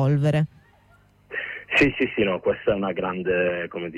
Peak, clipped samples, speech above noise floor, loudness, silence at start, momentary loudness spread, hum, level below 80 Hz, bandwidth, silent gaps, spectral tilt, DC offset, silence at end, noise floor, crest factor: -8 dBFS; under 0.1%; 34 dB; -23 LUFS; 0 s; 11 LU; 50 Hz at -50 dBFS; -52 dBFS; 10.5 kHz; none; -7.5 dB/octave; under 0.1%; 0 s; -57 dBFS; 16 dB